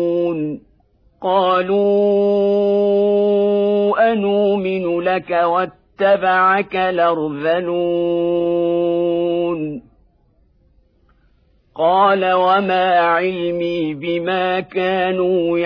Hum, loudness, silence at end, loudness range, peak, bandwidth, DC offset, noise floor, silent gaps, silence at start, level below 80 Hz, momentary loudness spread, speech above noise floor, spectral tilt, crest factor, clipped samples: none; -17 LUFS; 0 s; 5 LU; -4 dBFS; 5.2 kHz; under 0.1%; -57 dBFS; none; 0 s; -56 dBFS; 7 LU; 41 dB; -8.5 dB/octave; 12 dB; under 0.1%